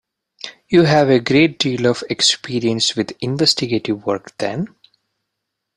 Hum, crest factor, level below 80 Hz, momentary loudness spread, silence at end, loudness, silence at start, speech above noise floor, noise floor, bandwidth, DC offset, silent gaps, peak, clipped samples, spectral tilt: none; 18 dB; -54 dBFS; 12 LU; 1.1 s; -17 LUFS; 0.45 s; 61 dB; -78 dBFS; 14 kHz; under 0.1%; none; 0 dBFS; under 0.1%; -4.5 dB/octave